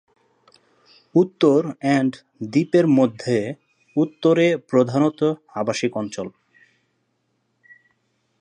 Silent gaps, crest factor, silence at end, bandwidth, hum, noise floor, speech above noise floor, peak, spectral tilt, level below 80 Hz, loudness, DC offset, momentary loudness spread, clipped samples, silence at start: none; 18 dB; 2.1 s; 9.8 kHz; none; -70 dBFS; 51 dB; -4 dBFS; -6.5 dB/octave; -70 dBFS; -20 LUFS; under 0.1%; 12 LU; under 0.1%; 1.15 s